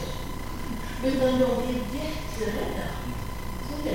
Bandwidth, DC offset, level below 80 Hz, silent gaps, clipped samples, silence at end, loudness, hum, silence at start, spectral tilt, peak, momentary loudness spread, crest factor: 16.5 kHz; 1%; -36 dBFS; none; under 0.1%; 0 s; -29 LUFS; none; 0 s; -5.5 dB/octave; -12 dBFS; 12 LU; 16 dB